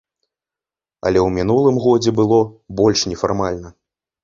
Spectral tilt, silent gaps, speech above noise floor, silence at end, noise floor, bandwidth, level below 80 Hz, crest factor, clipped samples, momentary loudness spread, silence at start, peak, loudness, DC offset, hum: -5.5 dB/octave; none; 73 dB; 0.55 s; -89 dBFS; 7.6 kHz; -42 dBFS; 16 dB; under 0.1%; 9 LU; 1.05 s; 0 dBFS; -17 LUFS; under 0.1%; none